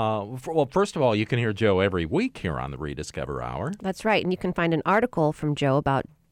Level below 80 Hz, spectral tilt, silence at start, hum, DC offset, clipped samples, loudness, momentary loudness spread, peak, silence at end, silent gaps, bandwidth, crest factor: -48 dBFS; -6.5 dB/octave; 0 s; none; under 0.1%; under 0.1%; -25 LUFS; 9 LU; -10 dBFS; 0.3 s; none; 15 kHz; 14 dB